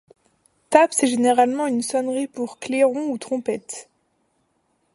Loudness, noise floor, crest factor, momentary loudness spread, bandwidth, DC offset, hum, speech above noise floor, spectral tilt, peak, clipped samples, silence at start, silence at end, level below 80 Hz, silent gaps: -21 LUFS; -68 dBFS; 22 dB; 13 LU; 11.5 kHz; under 0.1%; none; 48 dB; -3 dB/octave; 0 dBFS; under 0.1%; 0.7 s; 1.1 s; -70 dBFS; none